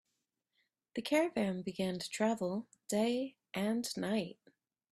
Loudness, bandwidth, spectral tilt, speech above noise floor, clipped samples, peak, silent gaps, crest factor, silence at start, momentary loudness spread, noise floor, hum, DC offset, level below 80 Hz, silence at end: -36 LUFS; 15.5 kHz; -5 dB/octave; 50 dB; under 0.1%; -18 dBFS; none; 20 dB; 0.95 s; 9 LU; -86 dBFS; none; under 0.1%; -76 dBFS; 0.6 s